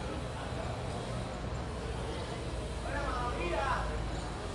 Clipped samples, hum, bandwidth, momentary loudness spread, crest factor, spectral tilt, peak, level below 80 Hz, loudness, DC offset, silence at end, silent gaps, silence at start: under 0.1%; none; 11.5 kHz; 5 LU; 16 dB; -5.5 dB/octave; -20 dBFS; -42 dBFS; -37 LUFS; under 0.1%; 0 s; none; 0 s